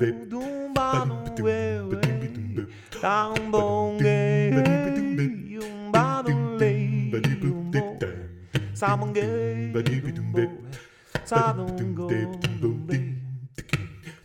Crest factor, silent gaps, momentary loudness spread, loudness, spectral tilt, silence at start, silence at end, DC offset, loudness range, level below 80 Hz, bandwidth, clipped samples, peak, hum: 20 dB; none; 12 LU; -26 LUFS; -7 dB/octave; 0 s; 0.1 s; under 0.1%; 4 LU; -52 dBFS; 15 kHz; under 0.1%; -6 dBFS; none